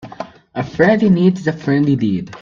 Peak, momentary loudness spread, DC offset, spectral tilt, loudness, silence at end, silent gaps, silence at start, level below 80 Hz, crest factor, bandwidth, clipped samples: 0 dBFS; 15 LU; under 0.1%; -8.5 dB/octave; -15 LUFS; 0 s; none; 0.05 s; -52 dBFS; 16 dB; 7.2 kHz; under 0.1%